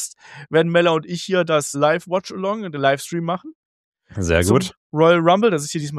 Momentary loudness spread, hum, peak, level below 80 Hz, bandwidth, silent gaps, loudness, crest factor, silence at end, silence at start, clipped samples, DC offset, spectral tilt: 11 LU; none; -2 dBFS; -44 dBFS; 14 kHz; 3.55-3.92 s, 4.77-4.90 s; -19 LUFS; 18 dB; 0 s; 0 s; under 0.1%; under 0.1%; -5 dB/octave